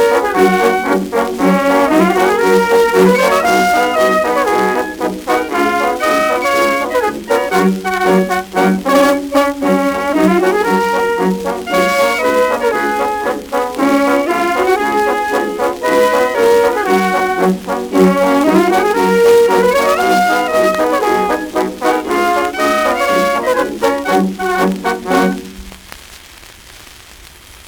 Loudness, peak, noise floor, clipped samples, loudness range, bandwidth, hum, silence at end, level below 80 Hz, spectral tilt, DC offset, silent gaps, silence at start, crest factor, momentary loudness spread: -13 LUFS; 0 dBFS; -38 dBFS; under 0.1%; 3 LU; over 20 kHz; none; 0 s; -44 dBFS; -5 dB/octave; under 0.1%; none; 0 s; 12 dB; 6 LU